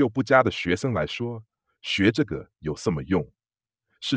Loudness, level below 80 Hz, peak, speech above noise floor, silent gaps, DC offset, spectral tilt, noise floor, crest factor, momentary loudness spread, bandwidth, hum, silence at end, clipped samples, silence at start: -25 LUFS; -52 dBFS; -2 dBFS; over 66 dB; none; under 0.1%; -6 dB/octave; under -90 dBFS; 22 dB; 14 LU; 9.6 kHz; none; 0 s; under 0.1%; 0 s